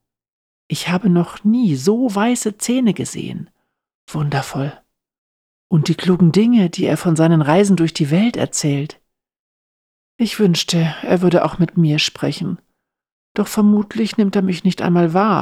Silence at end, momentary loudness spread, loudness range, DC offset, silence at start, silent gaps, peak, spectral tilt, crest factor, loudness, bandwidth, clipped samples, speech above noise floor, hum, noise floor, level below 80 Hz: 0 s; 11 LU; 6 LU; under 0.1%; 0.7 s; 3.95-4.07 s, 5.18-5.70 s, 9.39-10.19 s, 13.12-13.35 s; -4 dBFS; -6 dB/octave; 14 dB; -17 LUFS; 15 kHz; under 0.1%; over 74 dB; none; under -90 dBFS; -54 dBFS